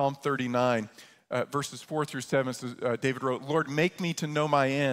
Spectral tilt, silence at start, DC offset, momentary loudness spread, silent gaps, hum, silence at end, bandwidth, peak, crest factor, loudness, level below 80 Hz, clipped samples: -5.5 dB/octave; 0 s; under 0.1%; 8 LU; none; none; 0 s; 16 kHz; -10 dBFS; 18 dB; -29 LUFS; -70 dBFS; under 0.1%